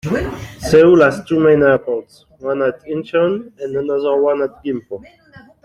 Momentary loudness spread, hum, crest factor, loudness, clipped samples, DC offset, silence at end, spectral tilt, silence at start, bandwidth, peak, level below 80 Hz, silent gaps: 15 LU; none; 14 dB; -15 LUFS; under 0.1%; under 0.1%; 0.25 s; -6.5 dB/octave; 0.05 s; 14 kHz; -2 dBFS; -44 dBFS; none